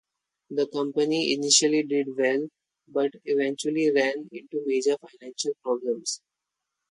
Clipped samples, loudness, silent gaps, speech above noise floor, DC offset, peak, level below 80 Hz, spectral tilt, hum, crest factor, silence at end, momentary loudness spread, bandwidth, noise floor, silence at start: under 0.1%; -25 LUFS; none; 59 dB; under 0.1%; -6 dBFS; -78 dBFS; -2.5 dB/octave; none; 20 dB; 0.75 s; 13 LU; 11.5 kHz; -85 dBFS; 0.5 s